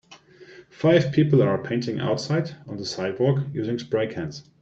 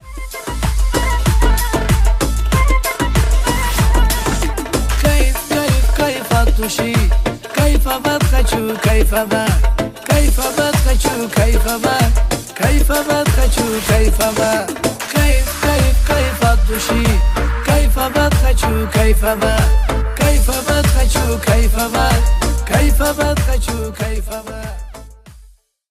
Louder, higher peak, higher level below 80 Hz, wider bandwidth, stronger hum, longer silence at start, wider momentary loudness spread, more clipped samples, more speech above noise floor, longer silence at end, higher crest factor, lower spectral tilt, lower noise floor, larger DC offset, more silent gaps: second, -24 LUFS vs -15 LUFS; second, -6 dBFS vs 0 dBFS; second, -60 dBFS vs -16 dBFS; second, 8 kHz vs 16 kHz; neither; about the same, 0.1 s vs 0.05 s; first, 13 LU vs 5 LU; neither; second, 26 dB vs 32 dB; second, 0.2 s vs 0.5 s; first, 18 dB vs 12 dB; first, -7 dB/octave vs -4.5 dB/octave; about the same, -49 dBFS vs -46 dBFS; neither; neither